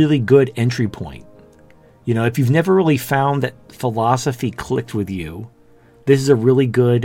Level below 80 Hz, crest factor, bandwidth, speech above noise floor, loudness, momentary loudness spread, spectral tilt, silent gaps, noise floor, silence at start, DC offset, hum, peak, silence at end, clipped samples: -50 dBFS; 16 dB; 17 kHz; 32 dB; -17 LUFS; 14 LU; -7 dB/octave; none; -49 dBFS; 0 s; under 0.1%; none; 0 dBFS; 0 s; under 0.1%